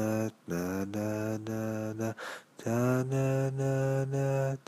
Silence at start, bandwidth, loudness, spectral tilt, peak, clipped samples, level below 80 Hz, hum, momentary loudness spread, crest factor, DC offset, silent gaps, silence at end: 0 s; 15.5 kHz; -32 LUFS; -7 dB/octave; -16 dBFS; under 0.1%; -66 dBFS; none; 7 LU; 14 dB; under 0.1%; none; 0.1 s